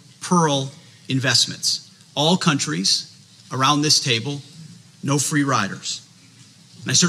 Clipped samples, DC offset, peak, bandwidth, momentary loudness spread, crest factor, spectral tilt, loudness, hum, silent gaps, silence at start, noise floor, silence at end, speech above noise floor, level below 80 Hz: under 0.1%; under 0.1%; -4 dBFS; 14.5 kHz; 15 LU; 18 dB; -3 dB/octave; -19 LUFS; none; none; 0.2 s; -48 dBFS; 0 s; 28 dB; -72 dBFS